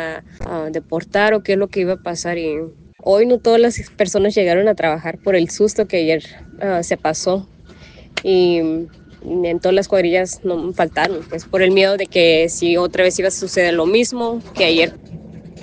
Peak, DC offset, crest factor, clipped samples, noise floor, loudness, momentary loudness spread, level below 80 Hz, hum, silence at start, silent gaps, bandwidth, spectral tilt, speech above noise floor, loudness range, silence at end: 0 dBFS; under 0.1%; 16 dB; under 0.1%; -41 dBFS; -17 LUFS; 12 LU; -46 dBFS; none; 0 s; none; 10 kHz; -4 dB/octave; 25 dB; 4 LU; 0 s